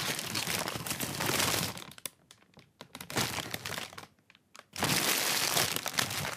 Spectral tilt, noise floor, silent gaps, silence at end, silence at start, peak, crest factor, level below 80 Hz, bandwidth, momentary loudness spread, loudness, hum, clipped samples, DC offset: -2 dB/octave; -63 dBFS; none; 0 s; 0 s; -10 dBFS; 26 dB; -62 dBFS; 16 kHz; 17 LU; -31 LUFS; none; under 0.1%; under 0.1%